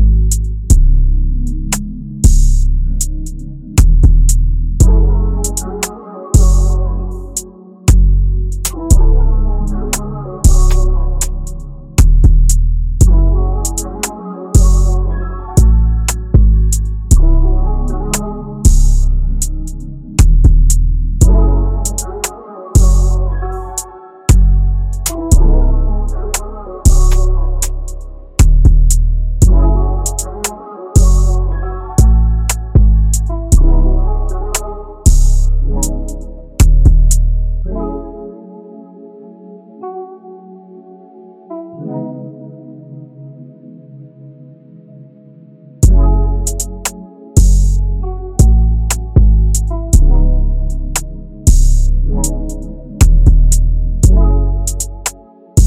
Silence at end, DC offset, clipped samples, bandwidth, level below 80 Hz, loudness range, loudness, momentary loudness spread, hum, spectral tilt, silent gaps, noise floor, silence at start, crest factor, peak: 0 s; 0.8%; under 0.1%; 15.5 kHz; -12 dBFS; 10 LU; -14 LUFS; 16 LU; none; -5.5 dB/octave; none; -39 dBFS; 0 s; 10 dB; 0 dBFS